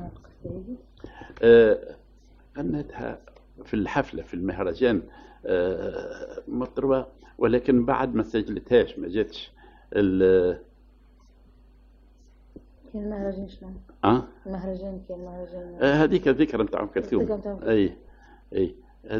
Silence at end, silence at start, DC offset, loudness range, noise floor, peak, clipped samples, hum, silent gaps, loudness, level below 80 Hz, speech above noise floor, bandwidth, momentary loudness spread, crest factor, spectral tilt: 0 s; 0 s; under 0.1%; 7 LU; -54 dBFS; -6 dBFS; under 0.1%; none; none; -24 LUFS; -48 dBFS; 30 dB; 6.8 kHz; 19 LU; 20 dB; -8 dB/octave